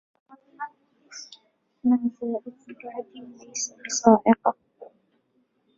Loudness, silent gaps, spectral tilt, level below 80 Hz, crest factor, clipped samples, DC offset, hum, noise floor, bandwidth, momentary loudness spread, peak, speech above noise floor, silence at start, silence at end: -23 LUFS; none; -4 dB/octave; -70 dBFS; 24 dB; under 0.1%; under 0.1%; none; -69 dBFS; 7.8 kHz; 24 LU; -2 dBFS; 45 dB; 0.6 s; 0.95 s